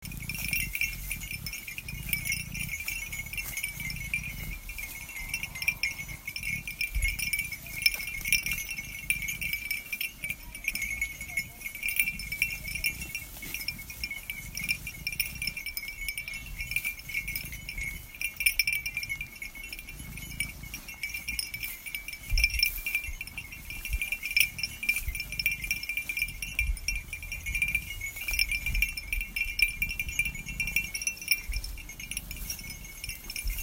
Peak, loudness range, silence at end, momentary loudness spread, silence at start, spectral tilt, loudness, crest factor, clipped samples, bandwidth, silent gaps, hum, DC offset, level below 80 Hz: -6 dBFS; 4 LU; 0 s; 11 LU; 0 s; -1 dB/octave; -31 LUFS; 28 dB; under 0.1%; 16.5 kHz; none; none; under 0.1%; -42 dBFS